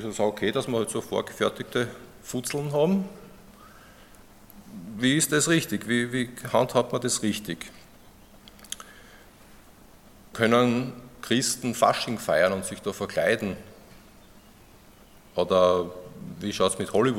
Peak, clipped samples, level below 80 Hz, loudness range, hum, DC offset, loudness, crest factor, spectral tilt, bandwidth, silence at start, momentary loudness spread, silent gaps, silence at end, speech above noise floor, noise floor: -6 dBFS; under 0.1%; -58 dBFS; 6 LU; none; under 0.1%; -26 LUFS; 22 dB; -4 dB/octave; 17 kHz; 0 s; 17 LU; none; 0 s; 27 dB; -52 dBFS